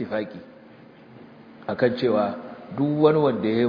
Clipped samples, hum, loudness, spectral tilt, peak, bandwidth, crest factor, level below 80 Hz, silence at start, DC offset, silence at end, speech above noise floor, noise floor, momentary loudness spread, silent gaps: under 0.1%; none; -23 LUFS; -9.5 dB/octave; -6 dBFS; 5.2 kHz; 18 dB; -66 dBFS; 0 s; under 0.1%; 0 s; 26 dB; -48 dBFS; 18 LU; none